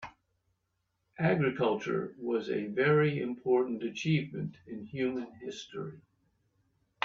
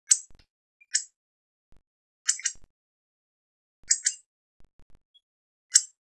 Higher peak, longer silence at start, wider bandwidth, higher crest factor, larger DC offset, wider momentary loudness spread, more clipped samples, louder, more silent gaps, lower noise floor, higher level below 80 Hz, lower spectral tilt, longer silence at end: second, -12 dBFS vs -2 dBFS; about the same, 0 s vs 0.1 s; second, 7.6 kHz vs 12 kHz; second, 20 dB vs 30 dB; neither; first, 15 LU vs 10 LU; neither; second, -32 LUFS vs -26 LUFS; second, none vs 0.50-0.80 s, 1.16-1.72 s, 1.87-2.25 s, 2.70-3.83 s, 4.26-4.60 s, 4.73-4.90 s, 5.05-5.14 s, 5.23-5.69 s; second, -81 dBFS vs under -90 dBFS; second, -72 dBFS vs -66 dBFS; first, -7 dB/octave vs 5.5 dB/octave; first, 1.05 s vs 0.2 s